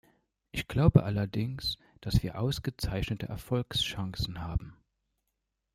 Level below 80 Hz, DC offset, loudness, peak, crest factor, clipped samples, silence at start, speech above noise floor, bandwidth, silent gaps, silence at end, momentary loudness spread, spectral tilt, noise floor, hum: -44 dBFS; under 0.1%; -31 LUFS; -6 dBFS; 24 dB; under 0.1%; 0.55 s; 53 dB; 15.5 kHz; none; 1 s; 13 LU; -6 dB/octave; -83 dBFS; none